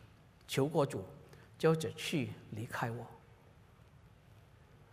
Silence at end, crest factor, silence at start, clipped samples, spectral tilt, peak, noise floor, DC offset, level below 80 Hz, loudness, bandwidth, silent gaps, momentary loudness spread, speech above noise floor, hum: 0.15 s; 22 dB; 0 s; under 0.1%; -5.5 dB/octave; -18 dBFS; -61 dBFS; under 0.1%; -70 dBFS; -36 LUFS; 15.5 kHz; none; 20 LU; 26 dB; none